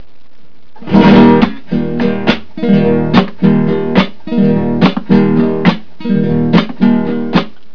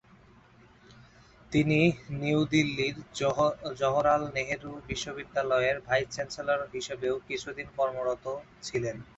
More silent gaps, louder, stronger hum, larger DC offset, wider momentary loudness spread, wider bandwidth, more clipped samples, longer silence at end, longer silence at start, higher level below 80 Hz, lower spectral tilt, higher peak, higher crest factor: neither; first, -11 LUFS vs -29 LUFS; neither; first, 8% vs under 0.1%; about the same, 8 LU vs 10 LU; second, 5.4 kHz vs 8.2 kHz; first, 0.7% vs under 0.1%; about the same, 0.25 s vs 0.15 s; about the same, 0.8 s vs 0.9 s; first, -38 dBFS vs -56 dBFS; first, -8.5 dB/octave vs -5.5 dB/octave; first, 0 dBFS vs -10 dBFS; second, 12 dB vs 20 dB